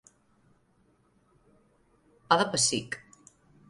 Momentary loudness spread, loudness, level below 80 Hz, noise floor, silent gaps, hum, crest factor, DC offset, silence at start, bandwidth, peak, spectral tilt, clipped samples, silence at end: 16 LU; -27 LUFS; -70 dBFS; -67 dBFS; none; none; 28 dB; under 0.1%; 2.3 s; 11.5 kHz; -6 dBFS; -2 dB/octave; under 0.1%; 0.7 s